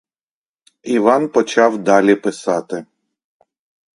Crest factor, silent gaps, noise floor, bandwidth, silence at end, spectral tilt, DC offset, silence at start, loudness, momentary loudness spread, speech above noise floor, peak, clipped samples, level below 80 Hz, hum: 18 dB; none; under -90 dBFS; 11 kHz; 1.15 s; -5 dB/octave; under 0.1%; 0.85 s; -15 LUFS; 14 LU; over 75 dB; 0 dBFS; under 0.1%; -64 dBFS; none